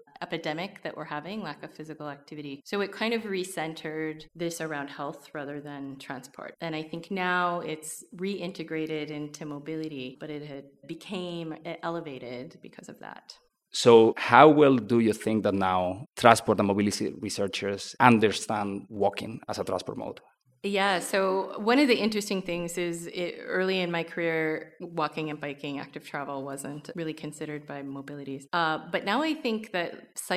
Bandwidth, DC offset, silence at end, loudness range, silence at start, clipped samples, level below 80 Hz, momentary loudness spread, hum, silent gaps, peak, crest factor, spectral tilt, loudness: 15 kHz; under 0.1%; 0 s; 14 LU; 0.2 s; under 0.1%; -68 dBFS; 18 LU; none; none; -2 dBFS; 26 dB; -5 dB/octave; -27 LUFS